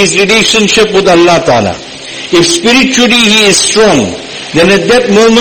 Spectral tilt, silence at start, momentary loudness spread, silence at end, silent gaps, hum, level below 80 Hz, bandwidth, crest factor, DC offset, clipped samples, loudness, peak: -3 dB/octave; 0 s; 11 LU; 0 s; none; none; -36 dBFS; over 20 kHz; 6 dB; 0.5%; 2%; -6 LUFS; 0 dBFS